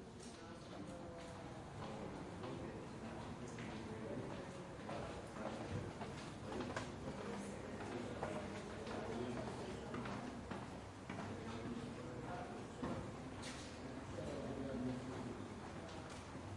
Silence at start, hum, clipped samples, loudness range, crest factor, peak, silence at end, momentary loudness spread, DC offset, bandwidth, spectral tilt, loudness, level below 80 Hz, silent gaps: 0 s; none; under 0.1%; 2 LU; 20 dB; -28 dBFS; 0 s; 6 LU; under 0.1%; 11.5 kHz; -5.5 dB/octave; -49 LUFS; -64 dBFS; none